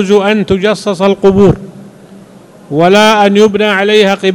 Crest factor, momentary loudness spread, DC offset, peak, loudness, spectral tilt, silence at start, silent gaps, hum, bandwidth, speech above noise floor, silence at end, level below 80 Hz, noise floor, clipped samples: 10 dB; 6 LU; under 0.1%; 0 dBFS; -8 LUFS; -5.5 dB/octave; 0 s; none; none; 12.5 kHz; 28 dB; 0 s; -38 dBFS; -36 dBFS; 3%